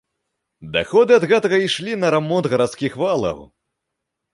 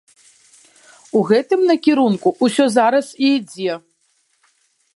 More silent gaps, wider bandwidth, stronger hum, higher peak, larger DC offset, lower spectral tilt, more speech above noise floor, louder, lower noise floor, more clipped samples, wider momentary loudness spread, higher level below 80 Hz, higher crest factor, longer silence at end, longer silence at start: neither; about the same, 11.5 kHz vs 11.5 kHz; neither; about the same, -2 dBFS vs -2 dBFS; neither; about the same, -5 dB/octave vs -5 dB/octave; first, 62 dB vs 48 dB; about the same, -18 LUFS vs -16 LUFS; first, -79 dBFS vs -64 dBFS; neither; about the same, 10 LU vs 10 LU; first, -54 dBFS vs -72 dBFS; about the same, 16 dB vs 16 dB; second, 0.9 s vs 1.15 s; second, 0.6 s vs 1.15 s